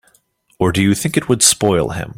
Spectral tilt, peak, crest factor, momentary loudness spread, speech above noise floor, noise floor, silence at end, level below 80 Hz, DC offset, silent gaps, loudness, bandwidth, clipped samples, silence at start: -3.5 dB/octave; 0 dBFS; 16 dB; 7 LU; 43 dB; -58 dBFS; 0.05 s; -44 dBFS; under 0.1%; none; -14 LUFS; 16.5 kHz; under 0.1%; 0.6 s